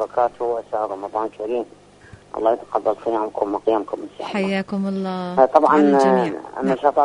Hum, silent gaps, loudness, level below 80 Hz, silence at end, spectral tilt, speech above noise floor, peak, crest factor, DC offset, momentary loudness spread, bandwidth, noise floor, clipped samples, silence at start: 50 Hz at -55 dBFS; none; -20 LUFS; -60 dBFS; 0 s; -7 dB/octave; 26 dB; 0 dBFS; 20 dB; under 0.1%; 12 LU; 10.5 kHz; -46 dBFS; under 0.1%; 0 s